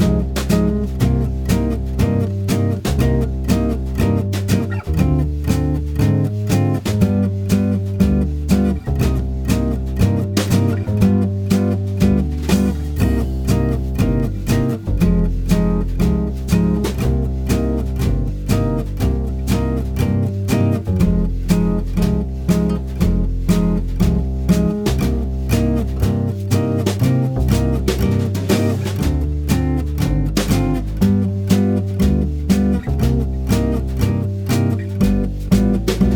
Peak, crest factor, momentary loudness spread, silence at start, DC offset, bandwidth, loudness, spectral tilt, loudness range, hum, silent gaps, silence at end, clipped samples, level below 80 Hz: 0 dBFS; 16 dB; 4 LU; 0 s; under 0.1%; 19 kHz; -18 LUFS; -7 dB/octave; 1 LU; none; none; 0 s; under 0.1%; -22 dBFS